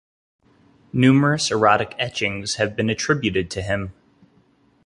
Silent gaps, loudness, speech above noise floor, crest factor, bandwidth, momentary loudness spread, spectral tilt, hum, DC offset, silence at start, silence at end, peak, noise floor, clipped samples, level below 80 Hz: none; -20 LUFS; 39 dB; 20 dB; 11.5 kHz; 10 LU; -5 dB/octave; none; under 0.1%; 0.95 s; 0.95 s; -2 dBFS; -59 dBFS; under 0.1%; -48 dBFS